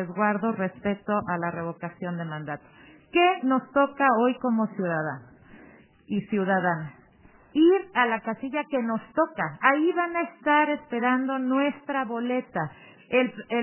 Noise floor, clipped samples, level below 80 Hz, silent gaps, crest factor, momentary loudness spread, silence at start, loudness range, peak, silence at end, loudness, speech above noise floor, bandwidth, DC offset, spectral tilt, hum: -55 dBFS; under 0.1%; -66 dBFS; none; 22 dB; 11 LU; 0 s; 3 LU; -4 dBFS; 0 s; -26 LUFS; 30 dB; 3.2 kHz; under 0.1%; -4.5 dB/octave; none